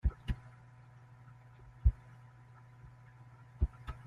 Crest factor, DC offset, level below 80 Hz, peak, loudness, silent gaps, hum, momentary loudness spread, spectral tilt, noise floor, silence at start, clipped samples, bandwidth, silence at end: 24 dB; under 0.1%; -40 dBFS; -14 dBFS; -38 LUFS; none; none; 23 LU; -8 dB/octave; -57 dBFS; 0.05 s; under 0.1%; 4.2 kHz; 0.05 s